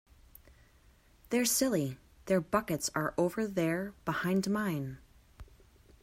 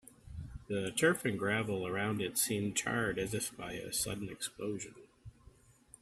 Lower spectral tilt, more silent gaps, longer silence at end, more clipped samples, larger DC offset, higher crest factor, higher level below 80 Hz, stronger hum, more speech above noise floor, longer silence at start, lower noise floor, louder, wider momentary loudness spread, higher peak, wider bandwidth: about the same, -4.5 dB/octave vs -3.5 dB/octave; neither; about the same, 0.6 s vs 0.55 s; neither; neither; about the same, 20 dB vs 22 dB; about the same, -60 dBFS vs -60 dBFS; neither; first, 31 dB vs 26 dB; first, 1.3 s vs 0.25 s; about the same, -63 dBFS vs -62 dBFS; first, -32 LUFS vs -35 LUFS; second, 10 LU vs 17 LU; about the same, -14 dBFS vs -14 dBFS; about the same, 16 kHz vs 15.5 kHz